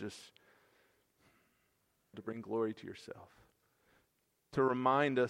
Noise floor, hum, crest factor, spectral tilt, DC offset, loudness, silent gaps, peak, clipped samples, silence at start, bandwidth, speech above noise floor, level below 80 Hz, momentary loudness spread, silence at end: -79 dBFS; none; 22 dB; -6.5 dB/octave; under 0.1%; -35 LUFS; none; -16 dBFS; under 0.1%; 0 s; 14 kHz; 44 dB; -76 dBFS; 23 LU; 0 s